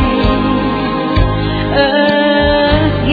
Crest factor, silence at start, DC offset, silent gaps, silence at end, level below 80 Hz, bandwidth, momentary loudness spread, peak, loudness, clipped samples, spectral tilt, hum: 12 dB; 0 s; under 0.1%; none; 0 s; -22 dBFS; 4.9 kHz; 4 LU; 0 dBFS; -12 LUFS; under 0.1%; -8.5 dB/octave; none